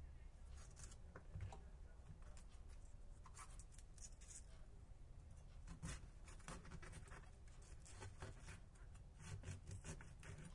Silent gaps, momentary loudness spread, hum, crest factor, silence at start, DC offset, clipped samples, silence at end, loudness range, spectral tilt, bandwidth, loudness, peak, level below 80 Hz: none; 8 LU; none; 20 dB; 0 s; under 0.1%; under 0.1%; 0 s; 3 LU; -4.5 dB/octave; 11.5 kHz; -60 LUFS; -38 dBFS; -60 dBFS